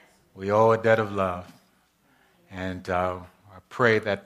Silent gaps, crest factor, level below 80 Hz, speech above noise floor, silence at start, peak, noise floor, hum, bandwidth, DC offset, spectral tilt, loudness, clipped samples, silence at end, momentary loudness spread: none; 20 dB; -62 dBFS; 40 dB; 0.35 s; -6 dBFS; -64 dBFS; none; 13.5 kHz; under 0.1%; -6.5 dB/octave; -24 LUFS; under 0.1%; 0.05 s; 18 LU